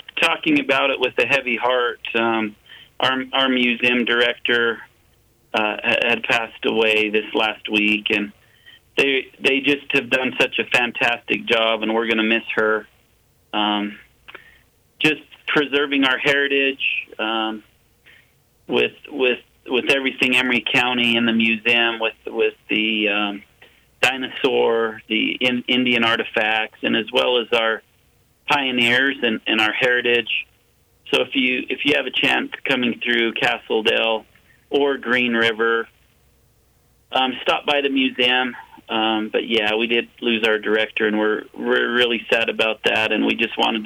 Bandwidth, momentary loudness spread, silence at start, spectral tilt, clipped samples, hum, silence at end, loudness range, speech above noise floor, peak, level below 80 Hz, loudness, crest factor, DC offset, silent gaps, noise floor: 16.5 kHz; 6 LU; 0.15 s; -4 dB/octave; under 0.1%; none; 0 s; 3 LU; 39 dB; -4 dBFS; -62 dBFS; -19 LUFS; 16 dB; under 0.1%; none; -59 dBFS